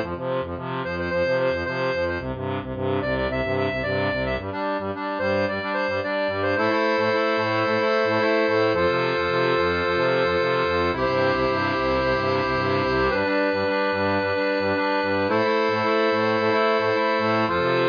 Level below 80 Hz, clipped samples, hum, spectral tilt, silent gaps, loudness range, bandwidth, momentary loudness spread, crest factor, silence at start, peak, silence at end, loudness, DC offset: -46 dBFS; under 0.1%; none; -6.5 dB/octave; none; 4 LU; 5.2 kHz; 6 LU; 14 dB; 0 s; -8 dBFS; 0 s; -22 LUFS; under 0.1%